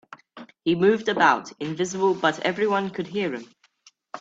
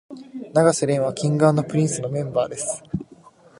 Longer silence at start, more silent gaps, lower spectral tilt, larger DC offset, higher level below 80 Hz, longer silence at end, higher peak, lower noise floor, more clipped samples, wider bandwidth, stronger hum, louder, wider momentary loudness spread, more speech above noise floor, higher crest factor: first, 0.35 s vs 0.1 s; neither; about the same, -5 dB/octave vs -6 dB/octave; neither; second, -68 dBFS vs -56 dBFS; second, 0 s vs 0.45 s; about the same, -4 dBFS vs -2 dBFS; first, -59 dBFS vs -49 dBFS; neither; second, 8 kHz vs 11.5 kHz; neither; about the same, -23 LUFS vs -21 LUFS; about the same, 12 LU vs 14 LU; first, 36 dB vs 28 dB; about the same, 20 dB vs 20 dB